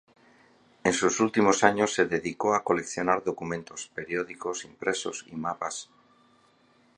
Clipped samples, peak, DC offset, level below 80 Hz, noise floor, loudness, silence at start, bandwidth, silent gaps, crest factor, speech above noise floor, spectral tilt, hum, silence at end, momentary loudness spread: under 0.1%; -2 dBFS; under 0.1%; -64 dBFS; -63 dBFS; -27 LUFS; 0.85 s; 11 kHz; none; 26 dB; 36 dB; -3.5 dB/octave; none; 1.15 s; 12 LU